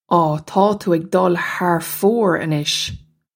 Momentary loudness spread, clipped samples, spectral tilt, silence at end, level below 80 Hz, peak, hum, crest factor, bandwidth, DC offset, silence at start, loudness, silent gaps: 4 LU; under 0.1%; -5 dB/octave; 0.35 s; -52 dBFS; 0 dBFS; none; 16 dB; 17 kHz; under 0.1%; 0.1 s; -18 LUFS; none